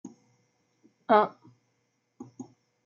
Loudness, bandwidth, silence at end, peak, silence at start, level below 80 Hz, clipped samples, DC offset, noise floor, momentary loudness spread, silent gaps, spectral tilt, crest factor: -25 LUFS; 7.2 kHz; 0.4 s; -8 dBFS; 0.05 s; -88 dBFS; under 0.1%; under 0.1%; -75 dBFS; 27 LU; none; -3.5 dB/octave; 24 dB